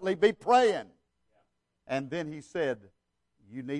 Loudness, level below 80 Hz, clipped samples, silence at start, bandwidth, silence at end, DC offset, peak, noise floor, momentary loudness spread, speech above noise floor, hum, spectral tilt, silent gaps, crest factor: -29 LUFS; -70 dBFS; under 0.1%; 0 s; 10.5 kHz; 0 s; under 0.1%; -10 dBFS; -74 dBFS; 17 LU; 46 dB; 60 Hz at -70 dBFS; -5 dB/octave; none; 20 dB